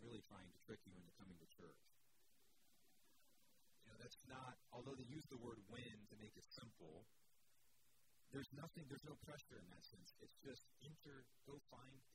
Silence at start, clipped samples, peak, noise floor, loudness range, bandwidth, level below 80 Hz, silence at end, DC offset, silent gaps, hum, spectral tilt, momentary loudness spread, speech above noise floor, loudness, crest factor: 0 s; under 0.1%; -40 dBFS; -82 dBFS; 8 LU; 16 kHz; -80 dBFS; 0 s; under 0.1%; none; none; -5 dB/octave; 9 LU; 22 dB; -61 LUFS; 22 dB